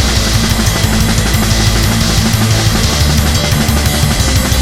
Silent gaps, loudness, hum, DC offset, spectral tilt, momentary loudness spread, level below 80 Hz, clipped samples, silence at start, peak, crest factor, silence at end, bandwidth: none; -11 LUFS; none; 2%; -4 dB/octave; 1 LU; -16 dBFS; under 0.1%; 0 s; 0 dBFS; 10 dB; 0 s; 17.5 kHz